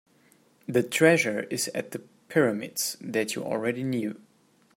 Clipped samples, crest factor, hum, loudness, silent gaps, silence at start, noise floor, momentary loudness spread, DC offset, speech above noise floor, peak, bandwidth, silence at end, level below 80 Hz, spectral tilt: under 0.1%; 22 dB; none; -26 LUFS; none; 0.7 s; -63 dBFS; 16 LU; under 0.1%; 37 dB; -6 dBFS; 16.5 kHz; 0.6 s; -72 dBFS; -4 dB/octave